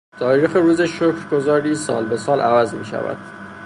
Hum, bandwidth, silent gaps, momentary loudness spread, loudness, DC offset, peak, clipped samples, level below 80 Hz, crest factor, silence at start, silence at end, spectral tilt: none; 11.5 kHz; none; 10 LU; -18 LUFS; under 0.1%; -4 dBFS; under 0.1%; -58 dBFS; 16 dB; 0.15 s; 0 s; -6 dB/octave